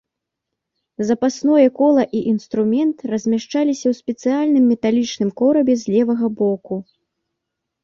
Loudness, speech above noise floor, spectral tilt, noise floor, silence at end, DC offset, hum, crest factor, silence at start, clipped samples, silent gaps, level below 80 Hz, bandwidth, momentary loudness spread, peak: -18 LUFS; 64 dB; -6 dB/octave; -81 dBFS; 1 s; under 0.1%; none; 16 dB; 1 s; under 0.1%; none; -62 dBFS; 7.4 kHz; 7 LU; -4 dBFS